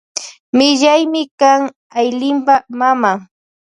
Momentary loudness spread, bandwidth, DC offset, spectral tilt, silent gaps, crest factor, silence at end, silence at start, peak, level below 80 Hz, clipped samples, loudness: 10 LU; 11 kHz; under 0.1%; -3 dB/octave; 0.40-0.53 s, 1.31-1.38 s, 1.76-1.90 s; 14 dB; 0.55 s; 0.15 s; 0 dBFS; -66 dBFS; under 0.1%; -14 LUFS